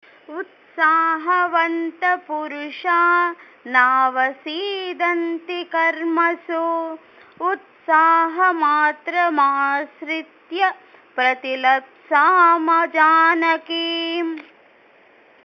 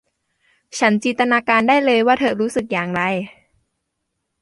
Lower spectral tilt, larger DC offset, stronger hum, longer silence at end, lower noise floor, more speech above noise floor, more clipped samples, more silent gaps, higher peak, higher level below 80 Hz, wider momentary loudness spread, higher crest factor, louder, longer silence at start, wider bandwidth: second, -3 dB/octave vs -4.5 dB/octave; neither; neither; about the same, 1 s vs 1.1 s; second, -52 dBFS vs -75 dBFS; second, 33 dB vs 58 dB; neither; neither; about the same, -2 dBFS vs -2 dBFS; second, -84 dBFS vs -60 dBFS; first, 13 LU vs 8 LU; about the same, 18 dB vs 18 dB; about the same, -18 LUFS vs -17 LUFS; second, 0.3 s vs 0.75 s; second, 6.4 kHz vs 11.5 kHz